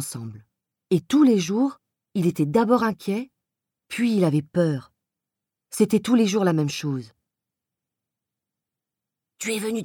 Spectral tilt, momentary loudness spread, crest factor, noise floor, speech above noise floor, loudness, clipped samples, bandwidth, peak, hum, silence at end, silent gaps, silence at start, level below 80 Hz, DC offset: -6 dB/octave; 14 LU; 18 dB; -87 dBFS; 65 dB; -23 LUFS; under 0.1%; 19 kHz; -6 dBFS; none; 0 s; none; 0 s; -66 dBFS; under 0.1%